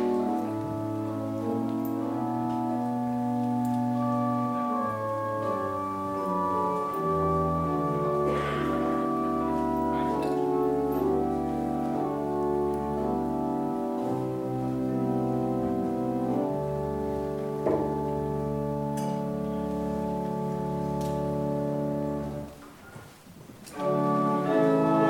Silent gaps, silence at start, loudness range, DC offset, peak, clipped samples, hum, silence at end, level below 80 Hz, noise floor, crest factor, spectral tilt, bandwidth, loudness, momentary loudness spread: none; 0 s; 3 LU; under 0.1%; -12 dBFS; under 0.1%; none; 0 s; -50 dBFS; -48 dBFS; 16 dB; -8 dB/octave; 17 kHz; -29 LUFS; 5 LU